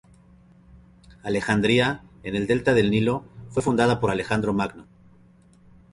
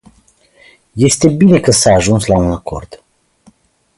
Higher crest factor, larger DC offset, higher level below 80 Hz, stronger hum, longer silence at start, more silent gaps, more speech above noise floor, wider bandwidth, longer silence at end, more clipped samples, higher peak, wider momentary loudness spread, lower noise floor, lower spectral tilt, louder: about the same, 18 dB vs 14 dB; neither; second, -50 dBFS vs -34 dBFS; neither; first, 1.25 s vs 0.95 s; neither; second, 32 dB vs 40 dB; about the same, 11.5 kHz vs 11.5 kHz; about the same, 1.1 s vs 1 s; neither; second, -6 dBFS vs 0 dBFS; second, 11 LU vs 17 LU; about the same, -54 dBFS vs -51 dBFS; about the same, -6 dB/octave vs -5 dB/octave; second, -23 LUFS vs -11 LUFS